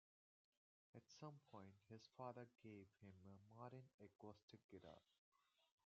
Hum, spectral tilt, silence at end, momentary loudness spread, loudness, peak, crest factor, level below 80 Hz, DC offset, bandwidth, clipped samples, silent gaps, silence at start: none; -6 dB/octave; 0.2 s; 9 LU; -63 LUFS; -40 dBFS; 24 dB; under -90 dBFS; under 0.1%; 7 kHz; under 0.1%; 3.94-3.98 s, 4.43-4.48 s, 4.64-4.69 s, 5.18-5.32 s; 0.95 s